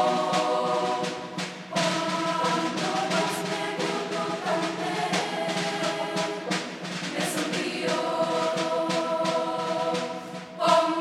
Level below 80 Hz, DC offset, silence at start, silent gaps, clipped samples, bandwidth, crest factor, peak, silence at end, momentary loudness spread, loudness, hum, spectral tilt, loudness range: -76 dBFS; under 0.1%; 0 s; none; under 0.1%; 15.5 kHz; 18 dB; -8 dBFS; 0 s; 6 LU; -27 LUFS; none; -4 dB/octave; 2 LU